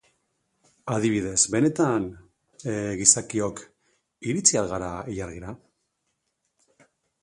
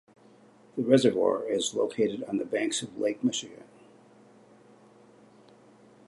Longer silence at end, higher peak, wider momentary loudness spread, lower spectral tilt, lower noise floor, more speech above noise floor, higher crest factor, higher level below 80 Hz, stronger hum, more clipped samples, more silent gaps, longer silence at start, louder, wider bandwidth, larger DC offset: second, 1.65 s vs 2.45 s; first, 0 dBFS vs -8 dBFS; first, 18 LU vs 11 LU; about the same, -3.5 dB/octave vs -4.5 dB/octave; first, -77 dBFS vs -57 dBFS; first, 52 dB vs 30 dB; about the same, 26 dB vs 24 dB; first, -54 dBFS vs -76 dBFS; neither; neither; neither; about the same, 0.85 s vs 0.75 s; first, -23 LUFS vs -28 LUFS; about the same, 11.5 kHz vs 11.5 kHz; neither